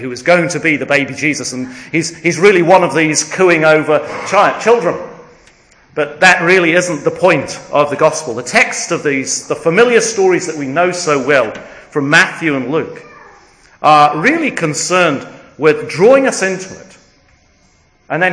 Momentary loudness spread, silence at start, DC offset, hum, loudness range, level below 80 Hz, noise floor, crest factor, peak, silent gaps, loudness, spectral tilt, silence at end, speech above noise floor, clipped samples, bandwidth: 11 LU; 0 s; under 0.1%; none; 3 LU; -56 dBFS; -52 dBFS; 14 dB; 0 dBFS; none; -12 LUFS; -4 dB/octave; 0 s; 39 dB; 0.4%; 11 kHz